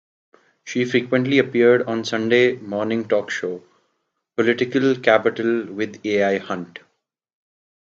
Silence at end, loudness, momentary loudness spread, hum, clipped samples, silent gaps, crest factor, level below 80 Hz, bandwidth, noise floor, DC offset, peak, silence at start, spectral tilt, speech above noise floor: 1.15 s; -20 LUFS; 12 LU; none; under 0.1%; none; 20 dB; -68 dBFS; 7.6 kHz; -73 dBFS; under 0.1%; 0 dBFS; 0.65 s; -5.5 dB/octave; 54 dB